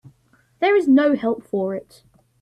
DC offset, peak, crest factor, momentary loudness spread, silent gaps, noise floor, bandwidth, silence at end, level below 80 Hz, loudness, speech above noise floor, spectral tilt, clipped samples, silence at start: under 0.1%; -6 dBFS; 14 dB; 11 LU; none; -59 dBFS; 9.6 kHz; 0.6 s; -64 dBFS; -19 LUFS; 41 dB; -7 dB/octave; under 0.1%; 0.6 s